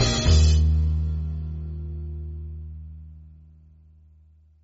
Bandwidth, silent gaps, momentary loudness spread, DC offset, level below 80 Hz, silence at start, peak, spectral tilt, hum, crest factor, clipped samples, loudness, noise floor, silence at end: 8 kHz; none; 23 LU; under 0.1%; -26 dBFS; 0 s; -6 dBFS; -6 dB/octave; none; 18 dB; under 0.1%; -24 LUFS; -55 dBFS; 1.35 s